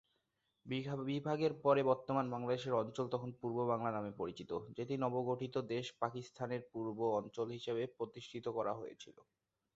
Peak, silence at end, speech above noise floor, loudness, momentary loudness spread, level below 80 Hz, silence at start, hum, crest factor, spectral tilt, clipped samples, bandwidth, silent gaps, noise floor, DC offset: -18 dBFS; 0.65 s; 45 dB; -39 LUFS; 10 LU; -76 dBFS; 0.65 s; none; 20 dB; -5.5 dB/octave; under 0.1%; 7.6 kHz; none; -84 dBFS; under 0.1%